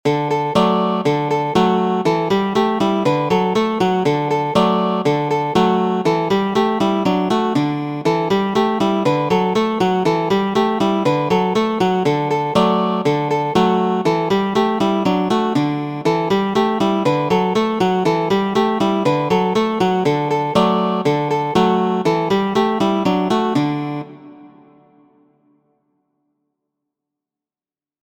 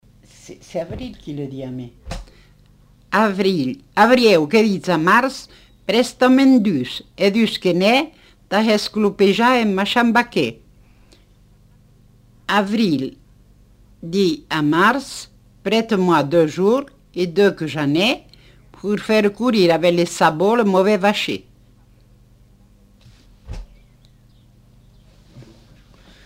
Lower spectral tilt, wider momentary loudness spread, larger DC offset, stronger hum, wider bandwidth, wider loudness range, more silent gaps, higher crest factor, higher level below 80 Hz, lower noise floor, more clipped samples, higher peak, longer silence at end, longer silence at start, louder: about the same, -6.5 dB/octave vs -5.5 dB/octave; second, 3 LU vs 17 LU; neither; second, none vs 50 Hz at -45 dBFS; about the same, 16.5 kHz vs 16 kHz; second, 1 LU vs 8 LU; neither; about the same, 18 dB vs 18 dB; second, -54 dBFS vs -48 dBFS; first, under -90 dBFS vs -51 dBFS; neither; about the same, 0 dBFS vs -2 dBFS; first, 3.55 s vs 0.85 s; second, 0.05 s vs 0.5 s; about the same, -17 LUFS vs -17 LUFS